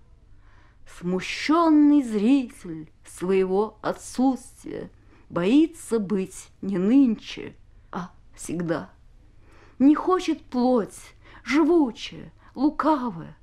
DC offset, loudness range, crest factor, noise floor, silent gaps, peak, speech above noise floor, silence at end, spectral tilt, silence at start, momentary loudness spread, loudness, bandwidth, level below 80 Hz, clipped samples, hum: under 0.1%; 4 LU; 16 dB; -51 dBFS; none; -8 dBFS; 28 dB; 0.1 s; -6 dB/octave; 0.95 s; 19 LU; -23 LUFS; 12.5 kHz; -54 dBFS; under 0.1%; none